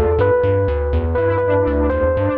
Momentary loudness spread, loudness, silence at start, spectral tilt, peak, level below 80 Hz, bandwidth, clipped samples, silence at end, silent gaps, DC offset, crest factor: 3 LU; -17 LUFS; 0 s; -11 dB/octave; -6 dBFS; -26 dBFS; 4.5 kHz; under 0.1%; 0 s; none; under 0.1%; 10 dB